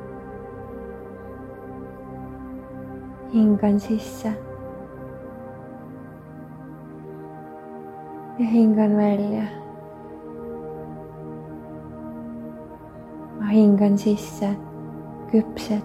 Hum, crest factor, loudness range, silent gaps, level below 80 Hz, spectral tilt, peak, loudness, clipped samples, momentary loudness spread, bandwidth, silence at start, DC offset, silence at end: none; 18 dB; 14 LU; none; -52 dBFS; -8 dB/octave; -8 dBFS; -22 LUFS; under 0.1%; 21 LU; 13 kHz; 0 s; under 0.1%; 0 s